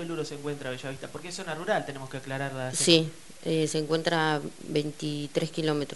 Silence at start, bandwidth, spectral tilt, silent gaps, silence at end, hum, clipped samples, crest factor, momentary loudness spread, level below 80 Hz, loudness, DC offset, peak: 0 s; 11.5 kHz; -4 dB/octave; none; 0 s; none; under 0.1%; 24 dB; 14 LU; -64 dBFS; -29 LUFS; 0.4%; -4 dBFS